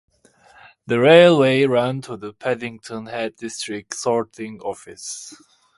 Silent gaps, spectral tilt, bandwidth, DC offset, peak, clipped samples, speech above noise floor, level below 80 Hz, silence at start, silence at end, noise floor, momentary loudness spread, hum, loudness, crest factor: none; -5 dB/octave; 11.5 kHz; under 0.1%; 0 dBFS; under 0.1%; 34 dB; -64 dBFS; 0.9 s; 0.45 s; -53 dBFS; 20 LU; none; -18 LUFS; 20 dB